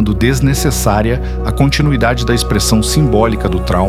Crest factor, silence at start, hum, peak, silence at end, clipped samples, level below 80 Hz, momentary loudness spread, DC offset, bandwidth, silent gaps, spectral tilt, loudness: 12 dB; 0 s; none; 0 dBFS; 0 s; under 0.1%; -20 dBFS; 4 LU; under 0.1%; 16 kHz; none; -5.5 dB/octave; -13 LUFS